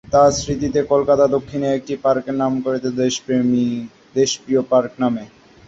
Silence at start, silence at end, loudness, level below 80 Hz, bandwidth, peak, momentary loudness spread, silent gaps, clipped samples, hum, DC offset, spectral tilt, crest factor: 0.1 s; 0.4 s; -19 LUFS; -46 dBFS; 8 kHz; -2 dBFS; 7 LU; none; under 0.1%; none; under 0.1%; -5 dB/octave; 16 dB